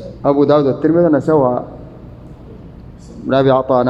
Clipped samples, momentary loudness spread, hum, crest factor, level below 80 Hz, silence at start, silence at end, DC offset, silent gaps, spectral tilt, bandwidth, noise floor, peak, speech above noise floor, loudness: under 0.1%; 19 LU; none; 14 dB; -42 dBFS; 0 s; 0 s; under 0.1%; none; -9 dB/octave; 8 kHz; -35 dBFS; 0 dBFS; 23 dB; -14 LUFS